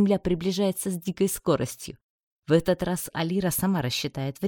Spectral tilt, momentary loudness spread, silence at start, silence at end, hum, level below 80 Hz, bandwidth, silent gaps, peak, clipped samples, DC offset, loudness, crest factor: -5.5 dB/octave; 8 LU; 0 s; 0 s; none; -52 dBFS; 17.5 kHz; 2.03-2.42 s; -8 dBFS; under 0.1%; under 0.1%; -26 LUFS; 18 dB